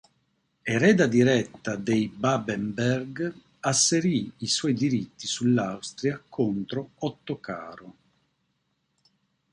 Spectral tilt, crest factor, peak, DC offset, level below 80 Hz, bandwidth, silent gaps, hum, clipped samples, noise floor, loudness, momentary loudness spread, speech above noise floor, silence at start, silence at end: -4.5 dB/octave; 20 dB; -6 dBFS; under 0.1%; -64 dBFS; 11.5 kHz; none; none; under 0.1%; -75 dBFS; -26 LUFS; 13 LU; 49 dB; 0.65 s; 1.6 s